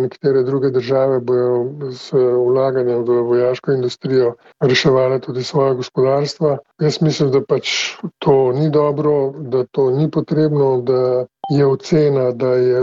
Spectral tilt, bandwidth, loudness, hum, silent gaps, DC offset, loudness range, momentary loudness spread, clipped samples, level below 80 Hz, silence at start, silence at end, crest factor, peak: -6.5 dB/octave; 7.8 kHz; -16 LUFS; none; none; under 0.1%; 1 LU; 6 LU; under 0.1%; -58 dBFS; 0 s; 0 s; 14 dB; -2 dBFS